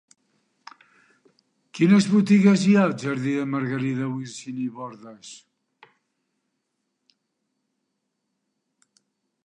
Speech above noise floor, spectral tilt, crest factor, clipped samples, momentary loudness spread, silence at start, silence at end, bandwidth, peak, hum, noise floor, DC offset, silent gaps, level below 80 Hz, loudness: 57 dB; -6.5 dB/octave; 20 dB; under 0.1%; 25 LU; 1.75 s; 4.1 s; 10 kHz; -6 dBFS; none; -78 dBFS; under 0.1%; none; -74 dBFS; -21 LUFS